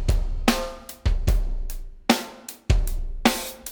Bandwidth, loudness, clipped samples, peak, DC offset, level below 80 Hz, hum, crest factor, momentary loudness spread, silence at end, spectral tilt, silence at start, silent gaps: over 20 kHz; -26 LUFS; under 0.1%; -2 dBFS; under 0.1%; -26 dBFS; none; 22 dB; 12 LU; 0 s; -4.5 dB/octave; 0 s; none